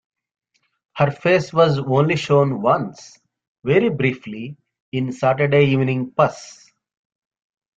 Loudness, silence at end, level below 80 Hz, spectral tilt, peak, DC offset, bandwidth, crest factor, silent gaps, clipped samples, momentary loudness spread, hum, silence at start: -18 LUFS; 1.25 s; -58 dBFS; -7 dB/octave; -2 dBFS; under 0.1%; 7.8 kHz; 18 dB; 3.47-3.55 s, 4.80-4.92 s; under 0.1%; 15 LU; none; 0.95 s